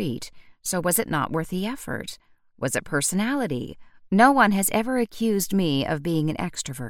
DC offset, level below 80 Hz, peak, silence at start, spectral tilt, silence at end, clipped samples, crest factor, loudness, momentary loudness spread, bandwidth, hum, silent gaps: under 0.1%; -52 dBFS; -2 dBFS; 0 s; -4.5 dB/octave; 0 s; under 0.1%; 22 dB; -24 LUFS; 14 LU; 17.5 kHz; none; none